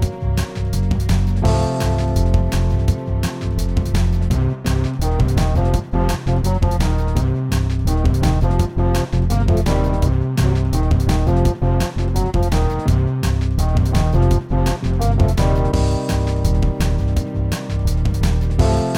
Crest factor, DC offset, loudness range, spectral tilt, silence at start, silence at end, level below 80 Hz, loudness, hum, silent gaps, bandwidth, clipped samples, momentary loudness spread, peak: 14 dB; under 0.1%; 1 LU; -7 dB/octave; 0 s; 0 s; -20 dBFS; -19 LUFS; none; none; 16.5 kHz; under 0.1%; 4 LU; -2 dBFS